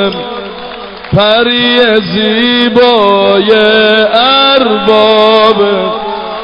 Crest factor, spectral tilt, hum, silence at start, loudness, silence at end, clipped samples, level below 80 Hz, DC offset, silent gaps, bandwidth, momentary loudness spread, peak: 8 dB; -6.5 dB/octave; none; 0 s; -7 LUFS; 0 s; 0.6%; -40 dBFS; under 0.1%; none; 6 kHz; 13 LU; 0 dBFS